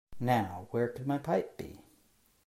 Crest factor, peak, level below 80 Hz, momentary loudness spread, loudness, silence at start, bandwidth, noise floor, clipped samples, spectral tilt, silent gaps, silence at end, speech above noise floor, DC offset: 20 dB; -16 dBFS; -64 dBFS; 14 LU; -33 LUFS; 0.1 s; 16 kHz; -68 dBFS; under 0.1%; -7.5 dB/octave; none; 0.65 s; 36 dB; under 0.1%